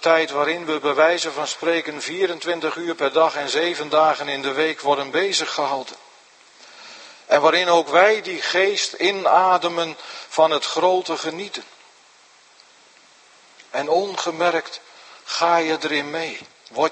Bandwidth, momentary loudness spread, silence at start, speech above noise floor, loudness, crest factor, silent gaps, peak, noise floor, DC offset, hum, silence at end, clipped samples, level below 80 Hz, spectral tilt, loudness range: 8.8 kHz; 14 LU; 0 s; 32 dB; -20 LUFS; 20 dB; none; 0 dBFS; -52 dBFS; under 0.1%; none; 0 s; under 0.1%; -78 dBFS; -2.5 dB/octave; 8 LU